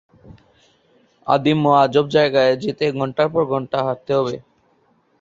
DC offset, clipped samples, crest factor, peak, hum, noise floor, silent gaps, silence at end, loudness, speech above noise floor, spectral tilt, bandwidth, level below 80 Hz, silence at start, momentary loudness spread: under 0.1%; under 0.1%; 18 dB; -2 dBFS; none; -60 dBFS; none; 0.8 s; -18 LUFS; 43 dB; -7 dB/octave; 7.8 kHz; -58 dBFS; 0.25 s; 8 LU